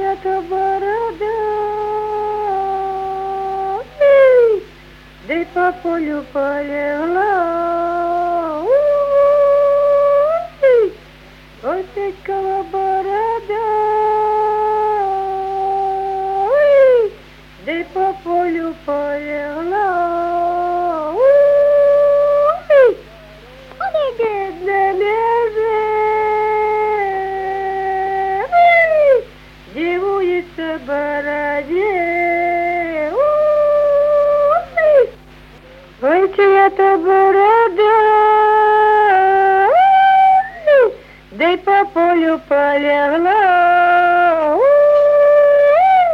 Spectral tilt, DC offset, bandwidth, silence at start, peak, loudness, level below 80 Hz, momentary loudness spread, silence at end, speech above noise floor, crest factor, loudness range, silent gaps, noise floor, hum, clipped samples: -6 dB/octave; under 0.1%; 6.4 kHz; 0 s; -2 dBFS; -14 LUFS; -46 dBFS; 11 LU; 0 s; 26 dB; 14 dB; 7 LU; none; -41 dBFS; none; under 0.1%